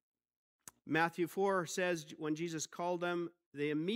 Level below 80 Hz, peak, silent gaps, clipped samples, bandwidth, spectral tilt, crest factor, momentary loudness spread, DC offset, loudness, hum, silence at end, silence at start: -86 dBFS; -18 dBFS; 3.46-3.52 s; under 0.1%; 16 kHz; -4.5 dB/octave; 20 dB; 7 LU; under 0.1%; -37 LUFS; none; 0 s; 0.85 s